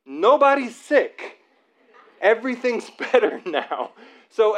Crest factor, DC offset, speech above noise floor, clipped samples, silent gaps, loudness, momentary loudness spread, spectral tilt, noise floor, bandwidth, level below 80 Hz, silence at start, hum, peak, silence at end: 18 dB; under 0.1%; 40 dB; under 0.1%; none; -21 LUFS; 16 LU; -3.5 dB/octave; -61 dBFS; 10.5 kHz; under -90 dBFS; 0.1 s; none; -4 dBFS; 0 s